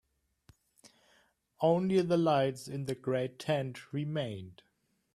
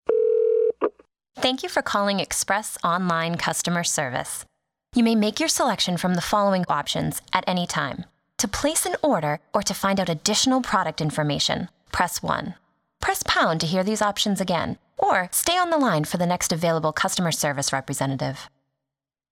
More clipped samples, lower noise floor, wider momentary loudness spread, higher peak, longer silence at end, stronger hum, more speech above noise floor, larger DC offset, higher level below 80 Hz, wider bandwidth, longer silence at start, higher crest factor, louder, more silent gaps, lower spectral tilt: neither; second, -69 dBFS vs -87 dBFS; first, 12 LU vs 7 LU; second, -16 dBFS vs -4 dBFS; second, 0.65 s vs 0.85 s; neither; second, 38 dB vs 64 dB; neither; second, -72 dBFS vs -52 dBFS; second, 13.5 kHz vs 18 kHz; first, 0.85 s vs 0.1 s; about the same, 18 dB vs 20 dB; second, -32 LUFS vs -23 LUFS; neither; first, -7 dB/octave vs -3.5 dB/octave